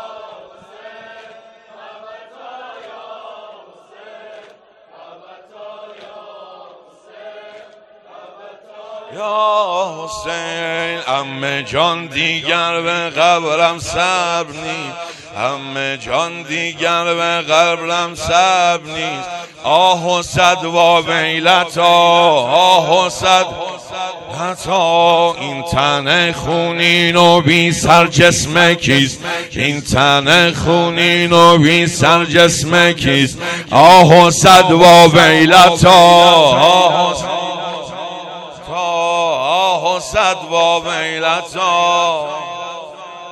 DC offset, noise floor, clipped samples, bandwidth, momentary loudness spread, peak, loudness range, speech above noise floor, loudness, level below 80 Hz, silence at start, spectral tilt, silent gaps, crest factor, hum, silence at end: under 0.1%; -45 dBFS; 1%; over 20 kHz; 18 LU; 0 dBFS; 11 LU; 33 dB; -11 LUFS; -44 dBFS; 0 s; -3.5 dB/octave; none; 14 dB; none; 0 s